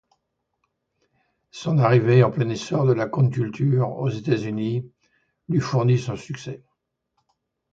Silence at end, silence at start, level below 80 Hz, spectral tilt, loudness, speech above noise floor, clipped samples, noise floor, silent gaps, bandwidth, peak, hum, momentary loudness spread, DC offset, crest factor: 1.15 s; 1.55 s; -60 dBFS; -7.5 dB/octave; -22 LUFS; 56 dB; under 0.1%; -77 dBFS; none; 7.6 kHz; -4 dBFS; none; 15 LU; under 0.1%; 20 dB